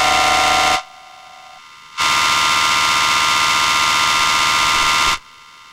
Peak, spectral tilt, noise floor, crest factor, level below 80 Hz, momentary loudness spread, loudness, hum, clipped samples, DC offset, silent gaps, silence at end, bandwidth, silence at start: 0 dBFS; 0 dB/octave; -42 dBFS; 16 dB; -42 dBFS; 4 LU; -14 LUFS; none; under 0.1%; under 0.1%; none; 0.5 s; 16 kHz; 0 s